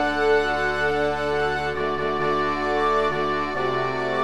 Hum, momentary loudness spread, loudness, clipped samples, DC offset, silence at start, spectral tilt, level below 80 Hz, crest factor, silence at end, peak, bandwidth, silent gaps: none; 4 LU; -23 LUFS; under 0.1%; 1%; 0 s; -5.5 dB/octave; -46 dBFS; 14 dB; 0 s; -8 dBFS; 12 kHz; none